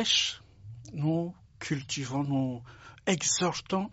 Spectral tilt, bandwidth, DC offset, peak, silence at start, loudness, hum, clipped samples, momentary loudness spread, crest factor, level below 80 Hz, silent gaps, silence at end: -3.5 dB/octave; 8 kHz; under 0.1%; -12 dBFS; 0 s; -30 LUFS; none; under 0.1%; 18 LU; 20 dB; -62 dBFS; none; 0 s